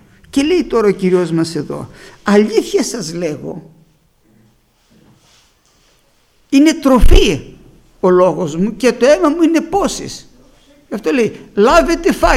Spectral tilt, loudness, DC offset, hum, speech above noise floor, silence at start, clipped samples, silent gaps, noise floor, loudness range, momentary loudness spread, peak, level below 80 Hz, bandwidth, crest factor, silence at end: -5.5 dB/octave; -14 LUFS; under 0.1%; none; 42 dB; 0.35 s; 0.1%; none; -54 dBFS; 9 LU; 15 LU; 0 dBFS; -22 dBFS; 14.5 kHz; 14 dB; 0 s